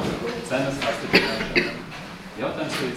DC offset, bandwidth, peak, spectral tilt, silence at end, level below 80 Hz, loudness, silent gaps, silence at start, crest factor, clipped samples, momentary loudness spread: under 0.1%; 16 kHz; -2 dBFS; -4.5 dB/octave; 0 s; -48 dBFS; -24 LUFS; none; 0 s; 24 dB; under 0.1%; 16 LU